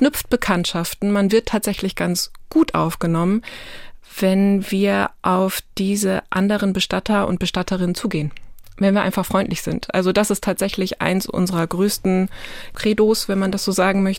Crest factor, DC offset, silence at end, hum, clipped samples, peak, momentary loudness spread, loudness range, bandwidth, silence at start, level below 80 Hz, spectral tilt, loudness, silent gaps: 18 dB; under 0.1%; 0 s; none; under 0.1%; -2 dBFS; 6 LU; 1 LU; 17 kHz; 0 s; -42 dBFS; -5 dB/octave; -20 LUFS; none